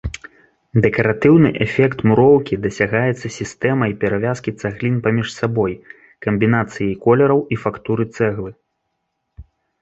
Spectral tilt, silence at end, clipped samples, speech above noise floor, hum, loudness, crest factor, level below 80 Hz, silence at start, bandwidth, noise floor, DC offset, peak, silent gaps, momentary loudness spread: -7.5 dB/octave; 0.4 s; under 0.1%; 57 dB; none; -17 LUFS; 16 dB; -44 dBFS; 0.05 s; 8.2 kHz; -73 dBFS; under 0.1%; 0 dBFS; none; 12 LU